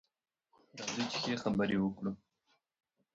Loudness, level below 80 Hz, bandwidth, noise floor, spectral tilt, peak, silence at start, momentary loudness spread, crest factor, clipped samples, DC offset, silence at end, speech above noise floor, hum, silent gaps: -36 LUFS; -66 dBFS; 7.6 kHz; -81 dBFS; -4.5 dB/octave; -20 dBFS; 0.75 s; 13 LU; 18 dB; under 0.1%; under 0.1%; 1 s; 46 dB; none; none